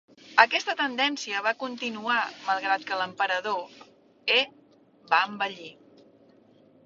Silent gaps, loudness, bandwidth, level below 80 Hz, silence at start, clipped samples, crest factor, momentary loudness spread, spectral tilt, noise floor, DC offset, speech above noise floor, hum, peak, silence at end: none; -26 LUFS; 7.8 kHz; -76 dBFS; 0.25 s; under 0.1%; 28 dB; 12 LU; -2 dB/octave; -58 dBFS; under 0.1%; 31 dB; none; -2 dBFS; 1.15 s